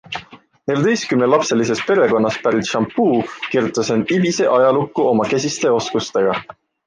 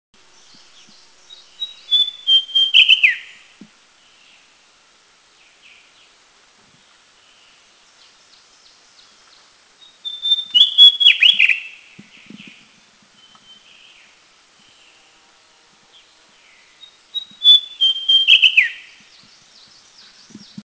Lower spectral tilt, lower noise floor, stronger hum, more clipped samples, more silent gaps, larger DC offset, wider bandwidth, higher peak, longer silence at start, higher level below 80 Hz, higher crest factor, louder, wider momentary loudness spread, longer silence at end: first, -5 dB/octave vs 1.5 dB/octave; second, -41 dBFS vs -53 dBFS; neither; neither; neither; neither; first, 10 kHz vs 8 kHz; about the same, -2 dBFS vs 0 dBFS; second, 0.1 s vs 1.6 s; first, -58 dBFS vs -70 dBFS; second, 14 dB vs 20 dB; second, -17 LUFS vs -11 LUFS; second, 6 LU vs 22 LU; second, 0.35 s vs 1.9 s